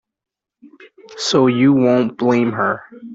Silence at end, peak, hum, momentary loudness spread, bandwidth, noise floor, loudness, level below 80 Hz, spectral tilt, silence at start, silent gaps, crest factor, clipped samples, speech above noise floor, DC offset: 0 s; -2 dBFS; none; 8 LU; 8 kHz; -48 dBFS; -16 LUFS; -58 dBFS; -5.5 dB/octave; 1.1 s; none; 14 dB; under 0.1%; 33 dB; under 0.1%